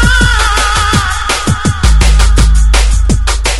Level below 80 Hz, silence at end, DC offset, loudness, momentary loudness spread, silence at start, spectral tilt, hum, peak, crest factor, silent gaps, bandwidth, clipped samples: -10 dBFS; 0 s; under 0.1%; -10 LUFS; 4 LU; 0 s; -3.5 dB/octave; none; 0 dBFS; 8 dB; none; 12 kHz; 0.7%